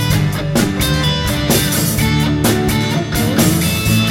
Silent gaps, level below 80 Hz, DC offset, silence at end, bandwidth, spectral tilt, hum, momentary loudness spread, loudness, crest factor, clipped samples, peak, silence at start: none; -28 dBFS; under 0.1%; 0 s; 16.5 kHz; -4.5 dB/octave; none; 3 LU; -15 LUFS; 14 dB; under 0.1%; 0 dBFS; 0 s